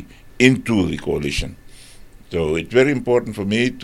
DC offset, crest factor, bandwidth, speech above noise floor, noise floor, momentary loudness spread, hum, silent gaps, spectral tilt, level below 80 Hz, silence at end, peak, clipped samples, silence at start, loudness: under 0.1%; 20 dB; 14.5 kHz; 23 dB; -41 dBFS; 9 LU; none; none; -5.5 dB/octave; -38 dBFS; 0 s; 0 dBFS; under 0.1%; 0 s; -19 LUFS